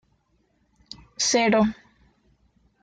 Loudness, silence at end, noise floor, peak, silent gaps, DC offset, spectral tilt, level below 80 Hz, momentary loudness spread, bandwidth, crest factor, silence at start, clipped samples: -21 LUFS; 1.1 s; -67 dBFS; -8 dBFS; none; under 0.1%; -3 dB/octave; -58 dBFS; 25 LU; 9.4 kHz; 18 dB; 1.2 s; under 0.1%